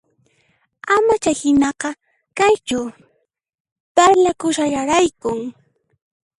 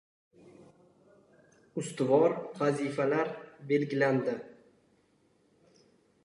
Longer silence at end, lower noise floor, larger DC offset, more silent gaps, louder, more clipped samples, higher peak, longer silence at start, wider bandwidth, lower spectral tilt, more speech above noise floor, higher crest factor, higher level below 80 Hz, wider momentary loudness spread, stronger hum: second, 0.9 s vs 1.75 s; about the same, -69 dBFS vs -69 dBFS; neither; first, 3.60-3.65 s, 3.72-3.95 s vs none; first, -17 LUFS vs -30 LUFS; neither; first, 0 dBFS vs -12 dBFS; second, 0.85 s vs 1.75 s; about the same, 11.5 kHz vs 11.5 kHz; second, -3.5 dB/octave vs -6.5 dB/octave; first, 52 dB vs 40 dB; about the same, 18 dB vs 20 dB; first, -52 dBFS vs -80 dBFS; about the same, 17 LU vs 15 LU; neither